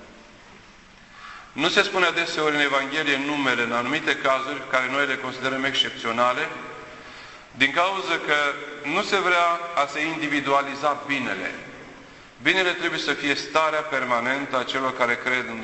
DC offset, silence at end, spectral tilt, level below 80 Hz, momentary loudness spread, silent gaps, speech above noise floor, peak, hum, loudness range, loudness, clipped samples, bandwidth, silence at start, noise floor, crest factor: under 0.1%; 0 s; -3 dB/octave; -60 dBFS; 16 LU; none; 25 dB; -2 dBFS; none; 2 LU; -23 LUFS; under 0.1%; 8.4 kHz; 0 s; -49 dBFS; 22 dB